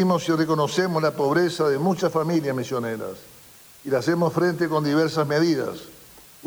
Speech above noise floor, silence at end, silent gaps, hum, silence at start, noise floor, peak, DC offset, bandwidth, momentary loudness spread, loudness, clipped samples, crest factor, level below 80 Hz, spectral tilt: 26 dB; 0 s; none; none; 0 s; -48 dBFS; -8 dBFS; under 0.1%; over 20 kHz; 11 LU; -23 LUFS; under 0.1%; 14 dB; -64 dBFS; -6 dB/octave